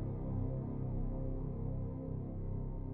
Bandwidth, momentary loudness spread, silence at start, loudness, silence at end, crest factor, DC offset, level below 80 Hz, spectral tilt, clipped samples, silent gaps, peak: 2.3 kHz; 3 LU; 0 s; -41 LUFS; 0 s; 12 dB; under 0.1%; -44 dBFS; -13 dB/octave; under 0.1%; none; -26 dBFS